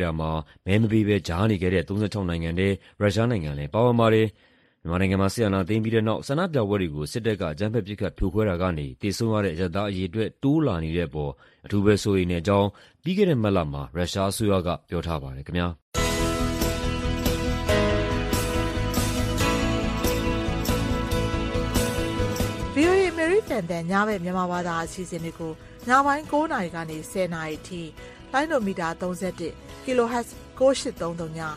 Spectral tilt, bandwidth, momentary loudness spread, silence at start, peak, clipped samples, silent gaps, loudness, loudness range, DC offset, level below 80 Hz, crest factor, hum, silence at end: -6 dB/octave; 15 kHz; 10 LU; 0 s; -6 dBFS; under 0.1%; 15.82-15.92 s; -25 LUFS; 3 LU; under 0.1%; -38 dBFS; 18 dB; none; 0 s